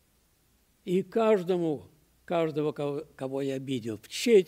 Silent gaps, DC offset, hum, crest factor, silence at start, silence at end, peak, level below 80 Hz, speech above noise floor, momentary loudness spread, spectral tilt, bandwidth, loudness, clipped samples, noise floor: none; under 0.1%; none; 18 dB; 0.85 s; 0 s; -10 dBFS; -70 dBFS; 40 dB; 11 LU; -5.5 dB/octave; 16 kHz; -30 LUFS; under 0.1%; -67 dBFS